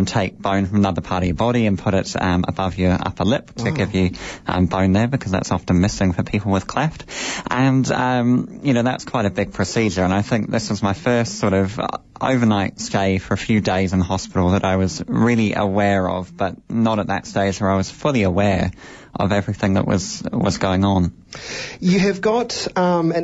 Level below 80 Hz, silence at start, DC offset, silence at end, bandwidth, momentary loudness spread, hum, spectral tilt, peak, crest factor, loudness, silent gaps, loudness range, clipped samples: -42 dBFS; 0 s; under 0.1%; 0 s; 8 kHz; 7 LU; none; -6 dB/octave; -6 dBFS; 14 dB; -20 LUFS; none; 1 LU; under 0.1%